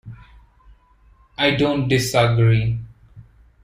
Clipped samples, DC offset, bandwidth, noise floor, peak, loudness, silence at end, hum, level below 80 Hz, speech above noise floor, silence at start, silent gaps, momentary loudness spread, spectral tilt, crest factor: under 0.1%; under 0.1%; 15 kHz; -53 dBFS; -2 dBFS; -18 LUFS; 0.4 s; none; -44 dBFS; 36 dB; 0.05 s; none; 11 LU; -5.5 dB/octave; 18 dB